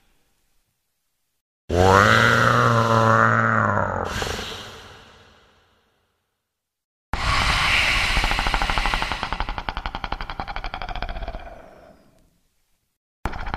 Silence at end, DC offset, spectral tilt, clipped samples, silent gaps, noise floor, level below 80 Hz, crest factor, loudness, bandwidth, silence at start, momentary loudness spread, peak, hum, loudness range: 0 s; under 0.1%; -4.5 dB/octave; under 0.1%; 6.84-7.13 s, 12.97-13.23 s; -80 dBFS; -34 dBFS; 22 dB; -20 LUFS; 15 kHz; 1.7 s; 18 LU; 0 dBFS; none; 16 LU